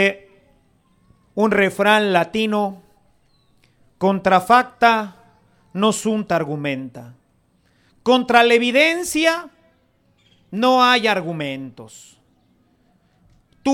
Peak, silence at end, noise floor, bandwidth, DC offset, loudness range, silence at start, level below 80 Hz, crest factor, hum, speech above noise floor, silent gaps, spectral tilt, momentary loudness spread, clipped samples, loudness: 0 dBFS; 0 s; -61 dBFS; 17.5 kHz; under 0.1%; 3 LU; 0 s; -60 dBFS; 20 dB; none; 43 dB; none; -4 dB/octave; 15 LU; under 0.1%; -17 LUFS